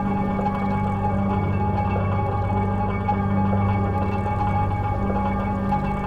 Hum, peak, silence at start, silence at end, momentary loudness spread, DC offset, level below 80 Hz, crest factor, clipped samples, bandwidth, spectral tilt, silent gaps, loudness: none; -10 dBFS; 0 s; 0 s; 2 LU; 0.5%; -34 dBFS; 12 dB; under 0.1%; 4.9 kHz; -9.5 dB/octave; none; -23 LUFS